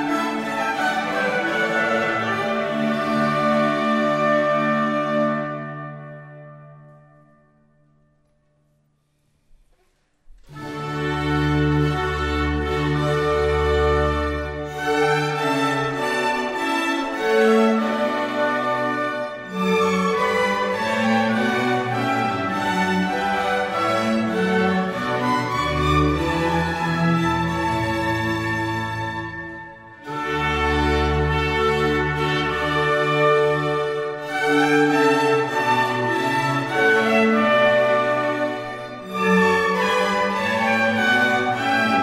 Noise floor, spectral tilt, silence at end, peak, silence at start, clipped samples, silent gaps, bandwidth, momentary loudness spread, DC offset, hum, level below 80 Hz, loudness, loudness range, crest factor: -65 dBFS; -5.5 dB/octave; 0 s; -6 dBFS; 0 s; under 0.1%; none; 16 kHz; 9 LU; under 0.1%; none; -38 dBFS; -20 LUFS; 5 LU; 16 dB